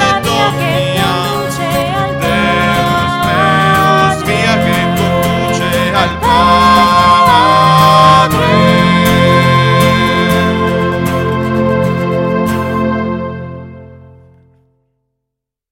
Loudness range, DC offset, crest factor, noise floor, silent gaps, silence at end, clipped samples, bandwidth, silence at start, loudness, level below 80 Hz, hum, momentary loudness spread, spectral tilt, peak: 8 LU; under 0.1%; 10 dB; -77 dBFS; none; 1.8 s; 0.2%; 17 kHz; 0 s; -10 LUFS; -34 dBFS; none; 8 LU; -5.5 dB/octave; 0 dBFS